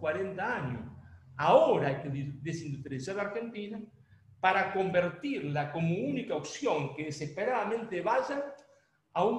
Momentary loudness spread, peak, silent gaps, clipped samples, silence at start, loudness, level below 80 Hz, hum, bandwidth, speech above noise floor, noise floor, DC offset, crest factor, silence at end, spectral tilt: 12 LU; -10 dBFS; none; under 0.1%; 0 s; -32 LUFS; -66 dBFS; none; 10.5 kHz; 35 dB; -66 dBFS; under 0.1%; 22 dB; 0 s; -6 dB/octave